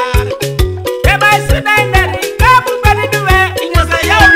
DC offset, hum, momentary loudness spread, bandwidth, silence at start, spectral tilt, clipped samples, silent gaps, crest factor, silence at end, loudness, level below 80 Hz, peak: under 0.1%; none; 7 LU; 16.5 kHz; 0 s; -4.5 dB/octave; 0.8%; none; 10 dB; 0 s; -10 LUFS; -18 dBFS; 0 dBFS